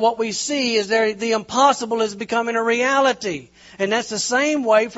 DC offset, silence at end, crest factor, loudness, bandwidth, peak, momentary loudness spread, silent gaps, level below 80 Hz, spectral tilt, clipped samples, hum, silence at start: under 0.1%; 0 s; 18 dB; -19 LUFS; 8.2 kHz; -2 dBFS; 6 LU; none; -62 dBFS; -2.5 dB/octave; under 0.1%; none; 0 s